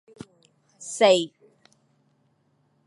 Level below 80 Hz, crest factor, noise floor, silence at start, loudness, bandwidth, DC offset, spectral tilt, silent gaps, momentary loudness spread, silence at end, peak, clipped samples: -76 dBFS; 22 dB; -67 dBFS; 0.8 s; -22 LUFS; 11.5 kHz; under 0.1%; -3 dB/octave; none; 28 LU; 1.6 s; -6 dBFS; under 0.1%